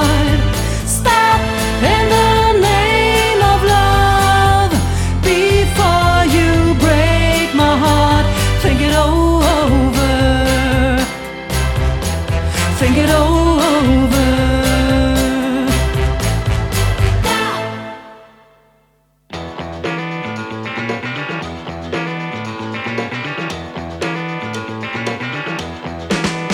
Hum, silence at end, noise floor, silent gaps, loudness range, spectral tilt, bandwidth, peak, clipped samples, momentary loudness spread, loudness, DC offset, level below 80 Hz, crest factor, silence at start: none; 0 s; -57 dBFS; none; 11 LU; -5 dB/octave; 18 kHz; 0 dBFS; under 0.1%; 12 LU; -14 LUFS; under 0.1%; -22 dBFS; 14 dB; 0 s